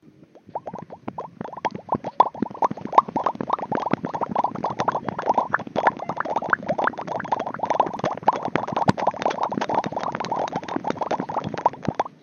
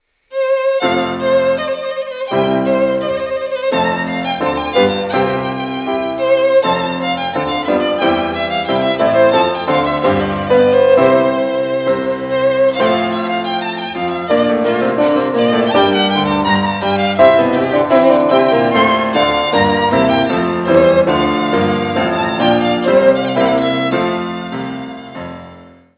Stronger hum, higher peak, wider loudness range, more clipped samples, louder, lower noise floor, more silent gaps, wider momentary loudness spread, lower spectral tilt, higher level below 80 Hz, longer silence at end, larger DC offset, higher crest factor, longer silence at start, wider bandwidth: neither; about the same, 0 dBFS vs 0 dBFS; about the same, 2 LU vs 4 LU; neither; second, -25 LUFS vs -14 LUFS; first, -49 dBFS vs -39 dBFS; neither; about the same, 9 LU vs 9 LU; second, -6 dB/octave vs -9.5 dB/octave; second, -60 dBFS vs -44 dBFS; second, 0.1 s vs 0.3 s; neither; first, 24 dB vs 14 dB; about the same, 0.35 s vs 0.3 s; first, 8.4 kHz vs 4 kHz